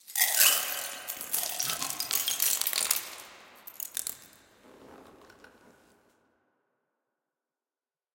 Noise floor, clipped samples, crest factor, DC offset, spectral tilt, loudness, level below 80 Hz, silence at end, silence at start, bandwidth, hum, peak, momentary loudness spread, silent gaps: under -90 dBFS; under 0.1%; 28 dB; under 0.1%; 2 dB/octave; -27 LUFS; -76 dBFS; 3.05 s; 0.1 s; 17.5 kHz; none; -6 dBFS; 24 LU; none